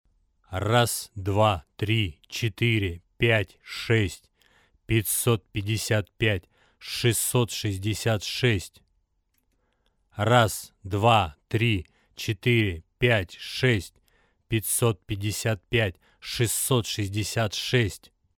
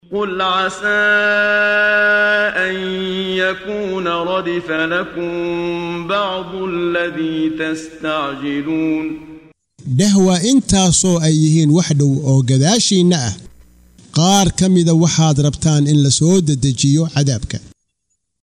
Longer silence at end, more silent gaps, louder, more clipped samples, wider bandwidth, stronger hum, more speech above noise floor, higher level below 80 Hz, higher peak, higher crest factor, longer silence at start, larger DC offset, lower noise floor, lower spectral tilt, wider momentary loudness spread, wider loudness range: second, 0.4 s vs 0.75 s; neither; second, -25 LUFS vs -15 LUFS; neither; first, 19 kHz vs 14 kHz; neither; second, 47 dB vs 56 dB; second, -50 dBFS vs -42 dBFS; second, -6 dBFS vs -2 dBFS; first, 22 dB vs 12 dB; first, 0.5 s vs 0.1 s; neither; about the same, -72 dBFS vs -71 dBFS; about the same, -4.5 dB/octave vs -4.5 dB/octave; about the same, 10 LU vs 10 LU; second, 3 LU vs 7 LU